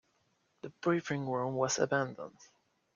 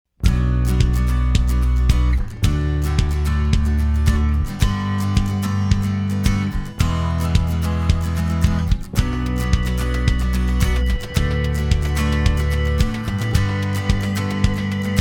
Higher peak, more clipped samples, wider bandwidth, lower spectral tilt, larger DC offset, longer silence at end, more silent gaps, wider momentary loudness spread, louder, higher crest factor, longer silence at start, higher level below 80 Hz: second, -16 dBFS vs -2 dBFS; neither; second, 7.4 kHz vs 17 kHz; second, -4.5 dB/octave vs -6 dB/octave; neither; first, 0.5 s vs 0 s; neither; first, 18 LU vs 3 LU; second, -33 LUFS vs -20 LUFS; about the same, 20 dB vs 16 dB; first, 0.65 s vs 0.2 s; second, -74 dBFS vs -20 dBFS